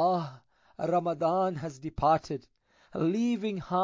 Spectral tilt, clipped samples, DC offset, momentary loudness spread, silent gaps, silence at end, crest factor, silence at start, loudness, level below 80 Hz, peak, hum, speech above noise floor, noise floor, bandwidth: -7.5 dB/octave; under 0.1%; under 0.1%; 12 LU; none; 0 s; 16 dB; 0 s; -30 LUFS; -56 dBFS; -14 dBFS; none; 25 dB; -54 dBFS; 7.6 kHz